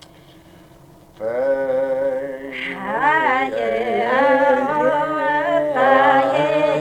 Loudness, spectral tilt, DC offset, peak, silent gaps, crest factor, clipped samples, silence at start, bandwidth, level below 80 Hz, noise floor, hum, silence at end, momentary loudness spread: -18 LUFS; -5.5 dB/octave; under 0.1%; -4 dBFS; none; 16 dB; under 0.1%; 1.2 s; 10 kHz; -56 dBFS; -46 dBFS; none; 0 s; 11 LU